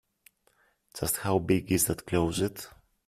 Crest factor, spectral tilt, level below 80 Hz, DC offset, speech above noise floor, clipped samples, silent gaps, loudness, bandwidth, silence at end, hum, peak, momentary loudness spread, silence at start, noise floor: 20 dB; -4.5 dB/octave; -52 dBFS; under 0.1%; 40 dB; under 0.1%; none; -28 LUFS; 16 kHz; 0.4 s; none; -12 dBFS; 17 LU; 0.95 s; -68 dBFS